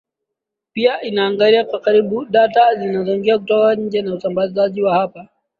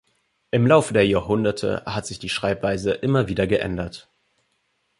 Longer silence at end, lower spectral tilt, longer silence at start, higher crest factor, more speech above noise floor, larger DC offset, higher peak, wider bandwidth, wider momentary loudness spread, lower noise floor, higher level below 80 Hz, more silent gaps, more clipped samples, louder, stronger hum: second, 0.35 s vs 1 s; first, -7.5 dB/octave vs -6 dB/octave; first, 0.75 s vs 0.55 s; second, 14 dB vs 20 dB; first, 66 dB vs 49 dB; neither; about the same, -2 dBFS vs -2 dBFS; second, 5 kHz vs 11.5 kHz; second, 7 LU vs 12 LU; first, -81 dBFS vs -70 dBFS; second, -62 dBFS vs -46 dBFS; neither; neither; first, -16 LUFS vs -22 LUFS; neither